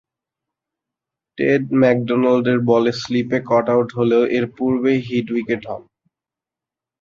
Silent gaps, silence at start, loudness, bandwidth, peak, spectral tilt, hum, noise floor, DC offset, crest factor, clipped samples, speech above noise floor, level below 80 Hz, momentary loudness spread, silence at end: none; 1.4 s; -18 LUFS; 7.4 kHz; -2 dBFS; -7 dB/octave; none; -88 dBFS; under 0.1%; 16 dB; under 0.1%; 70 dB; -58 dBFS; 7 LU; 1.2 s